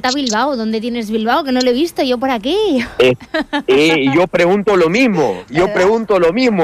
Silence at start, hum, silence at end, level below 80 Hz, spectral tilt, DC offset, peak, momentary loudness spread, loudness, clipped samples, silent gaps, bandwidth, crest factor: 0.05 s; none; 0 s; -46 dBFS; -5 dB/octave; under 0.1%; -2 dBFS; 7 LU; -14 LUFS; under 0.1%; none; 15 kHz; 12 dB